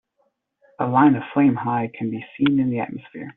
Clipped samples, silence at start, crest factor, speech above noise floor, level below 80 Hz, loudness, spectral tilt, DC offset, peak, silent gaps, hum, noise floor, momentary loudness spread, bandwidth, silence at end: under 0.1%; 0.8 s; 18 dB; 49 dB; -62 dBFS; -21 LUFS; -6 dB/octave; under 0.1%; -4 dBFS; none; none; -69 dBFS; 12 LU; 3.9 kHz; 0.05 s